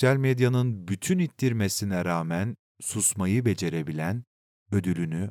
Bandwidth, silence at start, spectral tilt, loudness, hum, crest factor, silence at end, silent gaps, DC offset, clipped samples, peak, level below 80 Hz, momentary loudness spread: 17.5 kHz; 0 s; -5.5 dB/octave; -27 LUFS; none; 18 dB; 0 s; 2.59-2.75 s, 4.27-4.66 s; under 0.1%; under 0.1%; -8 dBFS; -68 dBFS; 8 LU